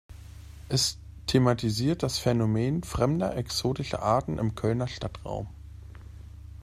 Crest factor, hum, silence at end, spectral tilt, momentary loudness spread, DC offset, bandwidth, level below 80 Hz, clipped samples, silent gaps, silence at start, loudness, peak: 20 dB; none; 0 s; -5.5 dB/octave; 21 LU; under 0.1%; 15 kHz; -46 dBFS; under 0.1%; none; 0.1 s; -28 LUFS; -8 dBFS